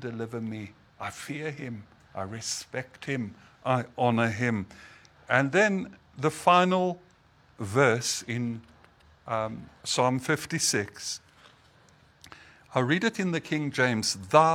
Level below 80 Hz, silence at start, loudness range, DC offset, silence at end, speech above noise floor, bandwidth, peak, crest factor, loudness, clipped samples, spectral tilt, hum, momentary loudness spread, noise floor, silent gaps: -66 dBFS; 0 s; 6 LU; under 0.1%; 0 s; 33 dB; 17 kHz; -4 dBFS; 24 dB; -28 LUFS; under 0.1%; -4 dB/octave; none; 16 LU; -60 dBFS; none